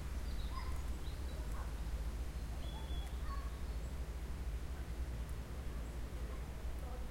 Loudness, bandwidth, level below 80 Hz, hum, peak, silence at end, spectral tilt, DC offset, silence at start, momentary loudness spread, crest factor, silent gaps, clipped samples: -46 LUFS; 16.5 kHz; -42 dBFS; none; -28 dBFS; 0 s; -5.5 dB/octave; under 0.1%; 0 s; 2 LU; 14 dB; none; under 0.1%